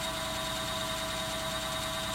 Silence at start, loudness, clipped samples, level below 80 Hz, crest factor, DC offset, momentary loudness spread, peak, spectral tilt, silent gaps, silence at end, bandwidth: 0 s; -33 LUFS; under 0.1%; -50 dBFS; 12 dB; under 0.1%; 0 LU; -22 dBFS; -2.5 dB/octave; none; 0 s; 16.5 kHz